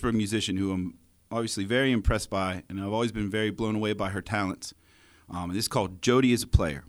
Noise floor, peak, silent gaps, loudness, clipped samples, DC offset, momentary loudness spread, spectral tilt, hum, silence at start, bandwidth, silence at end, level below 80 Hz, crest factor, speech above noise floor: -57 dBFS; -6 dBFS; none; -28 LUFS; under 0.1%; under 0.1%; 11 LU; -5 dB/octave; none; 0 s; over 20 kHz; 0.05 s; -38 dBFS; 22 dB; 30 dB